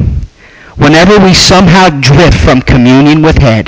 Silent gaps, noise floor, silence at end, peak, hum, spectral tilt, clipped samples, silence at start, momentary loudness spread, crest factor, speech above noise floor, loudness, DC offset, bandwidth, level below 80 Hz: none; -34 dBFS; 0 s; 0 dBFS; none; -5.5 dB/octave; 0.3%; 0 s; 4 LU; 4 dB; 31 dB; -4 LUFS; 0.6%; 8 kHz; -16 dBFS